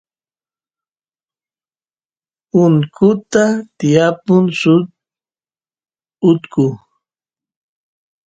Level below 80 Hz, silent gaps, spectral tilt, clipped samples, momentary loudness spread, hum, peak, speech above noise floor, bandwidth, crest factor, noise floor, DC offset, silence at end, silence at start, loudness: -58 dBFS; none; -7 dB/octave; under 0.1%; 6 LU; none; 0 dBFS; over 77 dB; 9 kHz; 16 dB; under -90 dBFS; under 0.1%; 1.5 s; 2.55 s; -14 LUFS